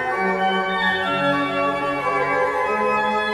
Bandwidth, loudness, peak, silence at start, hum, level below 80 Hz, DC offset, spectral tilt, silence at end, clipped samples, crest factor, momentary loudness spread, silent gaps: 15 kHz; -20 LUFS; -8 dBFS; 0 s; none; -54 dBFS; under 0.1%; -5 dB/octave; 0 s; under 0.1%; 12 dB; 2 LU; none